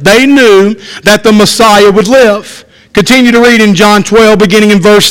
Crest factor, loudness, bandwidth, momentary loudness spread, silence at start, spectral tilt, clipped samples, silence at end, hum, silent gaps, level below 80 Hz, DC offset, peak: 4 dB; -4 LUFS; 17 kHz; 6 LU; 0 s; -4 dB/octave; 9%; 0 s; none; none; -34 dBFS; under 0.1%; 0 dBFS